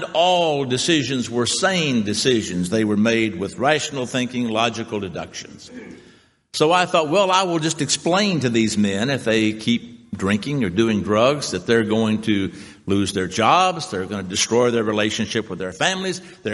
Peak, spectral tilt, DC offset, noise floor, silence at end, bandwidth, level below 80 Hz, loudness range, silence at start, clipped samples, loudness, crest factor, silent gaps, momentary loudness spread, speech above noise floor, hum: -2 dBFS; -4 dB/octave; under 0.1%; -47 dBFS; 0 s; 11.5 kHz; -58 dBFS; 3 LU; 0 s; under 0.1%; -20 LUFS; 18 dB; none; 10 LU; 27 dB; none